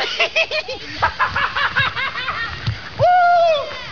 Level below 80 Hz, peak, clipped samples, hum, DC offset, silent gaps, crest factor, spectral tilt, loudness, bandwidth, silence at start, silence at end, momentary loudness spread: -42 dBFS; -4 dBFS; under 0.1%; none; 1%; none; 14 dB; -4 dB/octave; -18 LUFS; 5.4 kHz; 0 s; 0 s; 10 LU